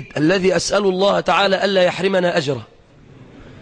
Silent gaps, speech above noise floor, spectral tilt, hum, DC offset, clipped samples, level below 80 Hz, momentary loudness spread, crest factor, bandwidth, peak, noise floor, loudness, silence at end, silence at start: none; 28 dB; -4.5 dB/octave; none; under 0.1%; under 0.1%; -50 dBFS; 4 LU; 14 dB; 10.5 kHz; -4 dBFS; -45 dBFS; -17 LUFS; 0 s; 0 s